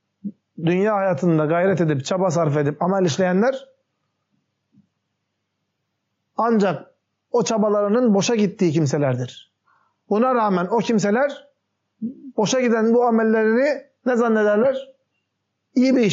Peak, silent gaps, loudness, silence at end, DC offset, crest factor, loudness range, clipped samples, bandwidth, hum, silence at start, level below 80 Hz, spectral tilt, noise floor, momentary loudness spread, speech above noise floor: -8 dBFS; none; -20 LUFS; 0 s; under 0.1%; 12 dB; 7 LU; under 0.1%; 8 kHz; none; 0.25 s; -72 dBFS; -6 dB/octave; -76 dBFS; 11 LU; 57 dB